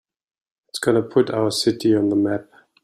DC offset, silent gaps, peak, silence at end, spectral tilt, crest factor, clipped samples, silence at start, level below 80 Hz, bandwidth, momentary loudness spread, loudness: under 0.1%; none; -4 dBFS; 0.4 s; -5 dB/octave; 18 dB; under 0.1%; 0.75 s; -60 dBFS; 13.5 kHz; 7 LU; -20 LUFS